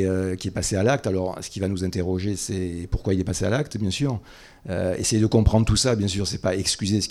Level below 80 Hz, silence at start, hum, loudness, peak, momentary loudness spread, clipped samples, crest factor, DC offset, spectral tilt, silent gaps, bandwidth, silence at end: -36 dBFS; 0 s; none; -24 LUFS; -4 dBFS; 9 LU; under 0.1%; 18 dB; under 0.1%; -5 dB/octave; none; 13.5 kHz; 0 s